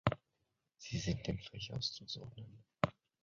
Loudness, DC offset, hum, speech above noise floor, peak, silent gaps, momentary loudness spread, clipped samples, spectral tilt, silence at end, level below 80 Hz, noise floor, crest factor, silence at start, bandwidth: -42 LUFS; under 0.1%; none; 42 dB; -14 dBFS; none; 14 LU; under 0.1%; -4.5 dB/octave; 0.3 s; -58 dBFS; -85 dBFS; 30 dB; 0.05 s; 7.4 kHz